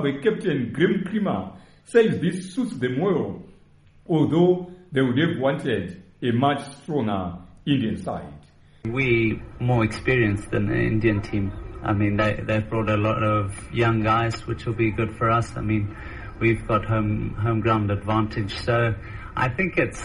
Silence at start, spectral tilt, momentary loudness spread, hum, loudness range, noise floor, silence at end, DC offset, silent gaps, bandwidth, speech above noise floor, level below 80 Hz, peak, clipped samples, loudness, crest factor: 0 s; -7.5 dB/octave; 9 LU; none; 2 LU; -53 dBFS; 0 s; under 0.1%; none; 11 kHz; 30 dB; -42 dBFS; -6 dBFS; under 0.1%; -23 LUFS; 18 dB